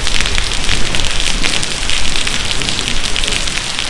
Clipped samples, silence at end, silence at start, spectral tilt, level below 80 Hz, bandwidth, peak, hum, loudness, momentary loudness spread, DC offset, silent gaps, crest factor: under 0.1%; 0 s; 0 s; -1.5 dB/octave; -20 dBFS; 11.5 kHz; 0 dBFS; none; -15 LUFS; 1 LU; under 0.1%; none; 12 dB